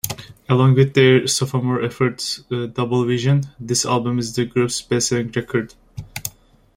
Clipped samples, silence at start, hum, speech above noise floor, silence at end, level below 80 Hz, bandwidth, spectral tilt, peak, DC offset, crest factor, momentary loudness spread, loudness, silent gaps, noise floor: under 0.1%; 0.05 s; none; 26 dB; 0.45 s; -50 dBFS; 16.5 kHz; -5 dB/octave; 0 dBFS; under 0.1%; 18 dB; 16 LU; -19 LUFS; none; -44 dBFS